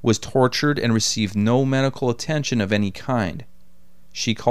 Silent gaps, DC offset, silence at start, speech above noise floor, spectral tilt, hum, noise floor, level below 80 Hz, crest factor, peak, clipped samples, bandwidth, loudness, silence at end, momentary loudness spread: none; 1%; 0.05 s; 36 dB; -5 dB/octave; none; -56 dBFS; -52 dBFS; 18 dB; -4 dBFS; under 0.1%; 14.5 kHz; -21 LUFS; 0 s; 7 LU